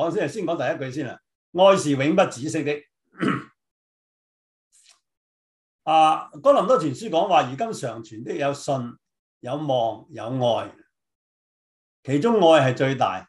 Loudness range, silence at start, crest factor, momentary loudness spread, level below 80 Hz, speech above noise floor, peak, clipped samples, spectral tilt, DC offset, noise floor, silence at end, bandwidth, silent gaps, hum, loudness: 7 LU; 0 s; 18 dB; 15 LU; -70 dBFS; over 69 dB; -4 dBFS; under 0.1%; -5.5 dB/octave; under 0.1%; under -90 dBFS; 0.05 s; 12 kHz; 1.35-1.53 s, 3.71-4.71 s, 5.17-5.79 s, 9.19-9.41 s, 11.15-12.03 s; none; -22 LUFS